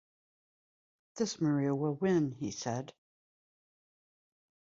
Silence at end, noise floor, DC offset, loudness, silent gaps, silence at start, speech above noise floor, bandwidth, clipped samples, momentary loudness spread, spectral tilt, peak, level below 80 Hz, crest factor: 1.8 s; under -90 dBFS; under 0.1%; -33 LUFS; none; 1.15 s; over 58 dB; 7.8 kHz; under 0.1%; 10 LU; -6 dB/octave; -18 dBFS; -74 dBFS; 18 dB